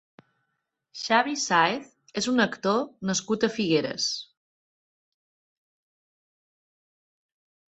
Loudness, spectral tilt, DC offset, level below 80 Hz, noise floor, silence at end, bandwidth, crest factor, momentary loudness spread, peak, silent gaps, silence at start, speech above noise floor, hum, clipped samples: -25 LUFS; -3.5 dB/octave; under 0.1%; -70 dBFS; -80 dBFS; 3.5 s; 8.4 kHz; 24 dB; 13 LU; -6 dBFS; none; 0.95 s; 54 dB; none; under 0.1%